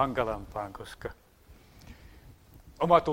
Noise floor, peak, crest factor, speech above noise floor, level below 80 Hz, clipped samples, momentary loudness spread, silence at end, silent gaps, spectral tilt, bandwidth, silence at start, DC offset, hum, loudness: -56 dBFS; -8 dBFS; 24 dB; 28 dB; -52 dBFS; under 0.1%; 28 LU; 0 s; none; -6.5 dB/octave; 16 kHz; 0 s; under 0.1%; none; -31 LUFS